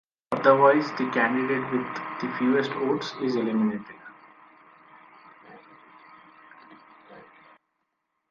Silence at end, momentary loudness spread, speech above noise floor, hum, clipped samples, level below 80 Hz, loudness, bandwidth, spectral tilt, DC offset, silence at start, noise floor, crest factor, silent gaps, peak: 1.1 s; 14 LU; 54 dB; none; under 0.1%; -74 dBFS; -24 LUFS; 7.2 kHz; -6.5 dB/octave; under 0.1%; 0.3 s; -78 dBFS; 22 dB; none; -4 dBFS